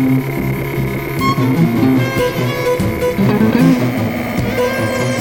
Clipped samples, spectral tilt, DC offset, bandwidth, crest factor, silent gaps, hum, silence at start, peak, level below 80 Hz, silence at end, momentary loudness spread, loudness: under 0.1%; -6.5 dB/octave; under 0.1%; 19.5 kHz; 14 dB; none; none; 0 s; 0 dBFS; -36 dBFS; 0 s; 7 LU; -15 LUFS